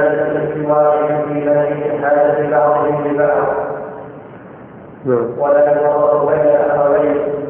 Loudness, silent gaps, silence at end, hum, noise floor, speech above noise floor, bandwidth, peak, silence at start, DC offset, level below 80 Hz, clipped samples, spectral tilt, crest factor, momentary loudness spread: -14 LUFS; none; 0 s; none; -35 dBFS; 22 dB; 3.4 kHz; -2 dBFS; 0 s; under 0.1%; -54 dBFS; under 0.1%; -12 dB/octave; 12 dB; 10 LU